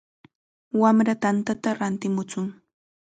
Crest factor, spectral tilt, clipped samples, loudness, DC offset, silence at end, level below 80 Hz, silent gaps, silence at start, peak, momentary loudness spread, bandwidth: 20 dB; -6.5 dB/octave; under 0.1%; -24 LUFS; under 0.1%; 0.65 s; -68 dBFS; none; 0.75 s; -6 dBFS; 12 LU; 9.2 kHz